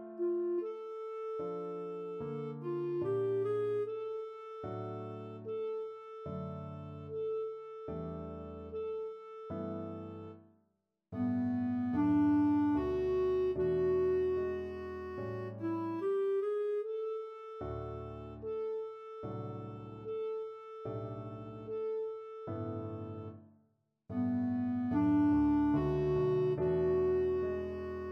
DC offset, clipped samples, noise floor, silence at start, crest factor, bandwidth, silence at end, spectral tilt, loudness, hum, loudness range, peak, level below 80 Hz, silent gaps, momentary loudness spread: under 0.1%; under 0.1%; -80 dBFS; 0 s; 14 dB; 5.8 kHz; 0 s; -10 dB/octave; -36 LUFS; none; 11 LU; -22 dBFS; -58 dBFS; none; 14 LU